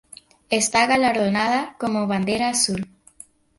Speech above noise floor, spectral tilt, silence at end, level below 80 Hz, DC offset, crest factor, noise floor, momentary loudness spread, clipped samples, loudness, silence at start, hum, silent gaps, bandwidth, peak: 28 dB; -3 dB/octave; 0.75 s; -56 dBFS; under 0.1%; 18 dB; -49 dBFS; 8 LU; under 0.1%; -20 LUFS; 0.5 s; none; none; 12 kHz; -4 dBFS